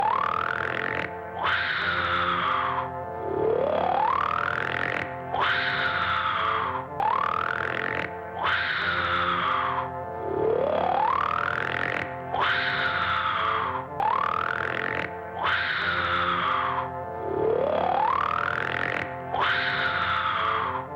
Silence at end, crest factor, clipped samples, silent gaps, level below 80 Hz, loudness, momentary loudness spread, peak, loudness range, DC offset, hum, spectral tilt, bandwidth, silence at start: 0 s; 12 dB; under 0.1%; none; -60 dBFS; -26 LUFS; 6 LU; -14 dBFS; 1 LU; under 0.1%; none; -5.5 dB/octave; 16.5 kHz; 0 s